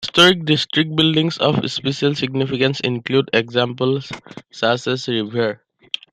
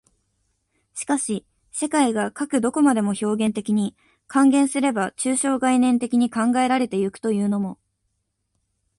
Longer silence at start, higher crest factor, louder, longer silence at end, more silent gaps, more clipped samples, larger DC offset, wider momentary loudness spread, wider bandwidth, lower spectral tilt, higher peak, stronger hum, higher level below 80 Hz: second, 0 s vs 0.95 s; about the same, 18 dB vs 18 dB; first, -18 LUFS vs -21 LUFS; second, 0.55 s vs 1.25 s; neither; neither; neither; about the same, 11 LU vs 9 LU; first, 14.5 kHz vs 11.5 kHz; about the same, -5 dB/octave vs -4.5 dB/octave; first, 0 dBFS vs -4 dBFS; neither; first, -58 dBFS vs -64 dBFS